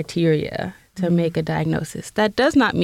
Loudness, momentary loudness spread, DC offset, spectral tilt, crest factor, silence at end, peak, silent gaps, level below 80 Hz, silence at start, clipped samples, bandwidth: -21 LUFS; 11 LU; under 0.1%; -6 dB/octave; 14 dB; 0 s; -8 dBFS; none; -50 dBFS; 0 s; under 0.1%; 14.5 kHz